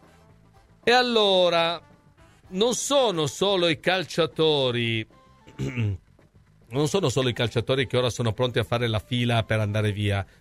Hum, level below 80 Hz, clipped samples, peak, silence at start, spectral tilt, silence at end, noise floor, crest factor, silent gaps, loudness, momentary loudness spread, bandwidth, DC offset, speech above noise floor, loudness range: none; -54 dBFS; under 0.1%; -8 dBFS; 0.85 s; -4.5 dB/octave; 0.15 s; -56 dBFS; 18 dB; none; -24 LUFS; 10 LU; 15 kHz; under 0.1%; 33 dB; 4 LU